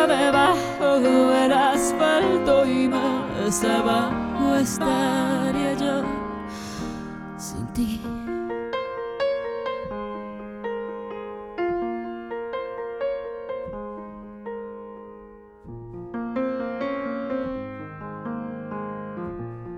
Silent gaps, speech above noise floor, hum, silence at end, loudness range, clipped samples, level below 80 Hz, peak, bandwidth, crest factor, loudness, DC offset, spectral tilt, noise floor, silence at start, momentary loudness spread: none; 23 dB; none; 0 s; 13 LU; under 0.1%; -50 dBFS; -6 dBFS; 16.5 kHz; 18 dB; -24 LUFS; under 0.1%; -4.5 dB/octave; -45 dBFS; 0 s; 17 LU